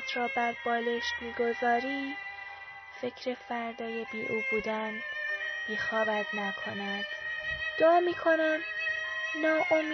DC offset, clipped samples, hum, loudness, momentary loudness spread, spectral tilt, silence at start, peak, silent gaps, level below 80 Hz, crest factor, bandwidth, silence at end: under 0.1%; under 0.1%; none; -31 LUFS; 11 LU; -1 dB/octave; 0 s; -14 dBFS; none; -64 dBFS; 16 dB; 6.2 kHz; 0 s